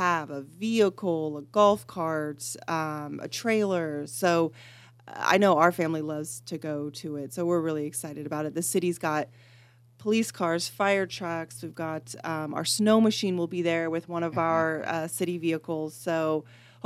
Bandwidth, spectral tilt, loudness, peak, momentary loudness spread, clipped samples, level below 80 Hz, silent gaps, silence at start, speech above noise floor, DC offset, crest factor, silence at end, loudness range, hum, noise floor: 15.5 kHz; -4.5 dB/octave; -28 LUFS; -6 dBFS; 12 LU; under 0.1%; -74 dBFS; none; 0 s; 29 dB; under 0.1%; 22 dB; 0.3 s; 4 LU; none; -56 dBFS